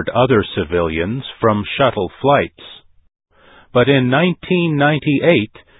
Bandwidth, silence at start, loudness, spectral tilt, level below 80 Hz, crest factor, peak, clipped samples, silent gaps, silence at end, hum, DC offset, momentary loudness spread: 4 kHz; 0 s; -16 LUFS; -10.5 dB/octave; -42 dBFS; 16 dB; 0 dBFS; under 0.1%; none; 0.35 s; none; under 0.1%; 6 LU